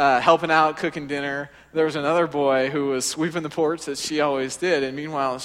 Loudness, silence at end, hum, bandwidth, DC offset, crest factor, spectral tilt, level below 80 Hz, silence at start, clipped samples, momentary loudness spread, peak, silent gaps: -22 LUFS; 0 s; none; 16 kHz; under 0.1%; 20 dB; -4 dB/octave; -60 dBFS; 0 s; under 0.1%; 9 LU; -2 dBFS; none